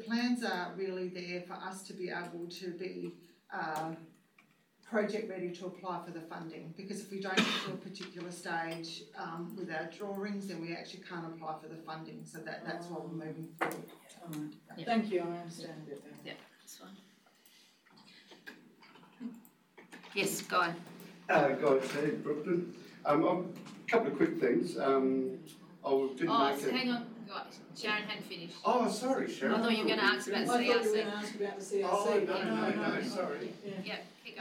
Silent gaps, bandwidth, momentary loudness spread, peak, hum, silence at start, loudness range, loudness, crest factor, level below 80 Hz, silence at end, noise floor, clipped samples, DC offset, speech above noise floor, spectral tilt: none; 18 kHz; 17 LU; -18 dBFS; none; 0 s; 11 LU; -35 LUFS; 18 dB; -86 dBFS; 0 s; -68 dBFS; under 0.1%; under 0.1%; 33 dB; -4.5 dB/octave